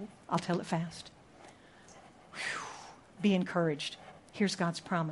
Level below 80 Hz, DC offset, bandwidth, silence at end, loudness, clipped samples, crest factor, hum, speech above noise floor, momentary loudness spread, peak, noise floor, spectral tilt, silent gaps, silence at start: -72 dBFS; under 0.1%; 11.5 kHz; 0 s; -34 LUFS; under 0.1%; 20 dB; none; 24 dB; 25 LU; -16 dBFS; -57 dBFS; -5.5 dB/octave; none; 0 s